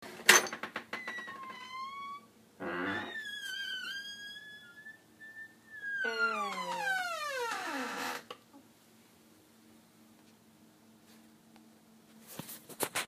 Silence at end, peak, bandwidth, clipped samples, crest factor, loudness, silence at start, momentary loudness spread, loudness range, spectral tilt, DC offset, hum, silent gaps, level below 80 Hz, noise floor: 0 s; -4 dBFS; 15.5 kHz; under 0.1%; 34 dB; -34 LUFS; 0 s; 18 LU; 11 LU; -0.5 dB/octave; under 0.1%; none; none; -84 dBFS; -62 dBFS